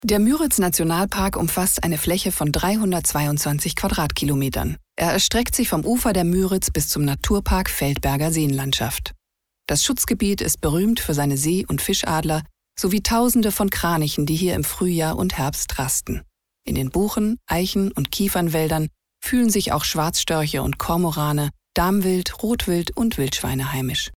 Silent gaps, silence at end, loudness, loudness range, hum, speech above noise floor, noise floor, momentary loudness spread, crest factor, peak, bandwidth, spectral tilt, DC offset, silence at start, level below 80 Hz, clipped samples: none; 0 s; -21 LUFS; 2 LU; none; 50 dB; -71 dBFS; 6 LU; 18 dB; -4 dBFS; over 20 kHz; -4.5 dB/octave; under 0.1%; 0 s; -36 dBFS; under 0.1%